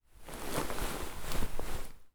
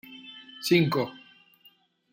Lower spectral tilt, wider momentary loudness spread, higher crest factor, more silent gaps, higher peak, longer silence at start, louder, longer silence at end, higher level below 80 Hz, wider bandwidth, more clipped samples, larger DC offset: second, -3.5 dB/octave vs -5.5 dB/octave; second, 8 LU vs 21 LU; second, 16 dB vs 22 dB; neither; second, -18 dBFS vs -8 dBFS; about the same, 0.2 s vs 0.1 s; second, -40 LUFS vs -26 LUFS; second, 0.05 s vs 0.95 s; first, -40 dBFS vs -70 dBFS; first, over 20 kHz vs 16.5 kHz; neither; neither